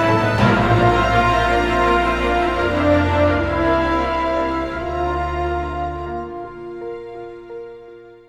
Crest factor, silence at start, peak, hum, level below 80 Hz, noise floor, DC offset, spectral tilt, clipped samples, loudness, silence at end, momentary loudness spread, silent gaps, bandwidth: 16 dB; 0 s; -2 dBFS; none; -30 dBFS; -40 dBFS; under 0.1%; -7 dB/octave; under 0.1%; -18 LUFS; 0.15 s; 17 LU; none; 13 kHz